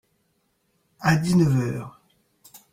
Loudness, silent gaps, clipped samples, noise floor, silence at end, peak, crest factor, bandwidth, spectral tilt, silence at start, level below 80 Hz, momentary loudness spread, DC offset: -22 LUFS; none; under 0.1%; -70 dBFS; 0.15 s; -6 dBFS; 18 dB; 16 kHz; -6.5 dB/octave; 1 s; -54 dBFS; 15 LU; under 0.1%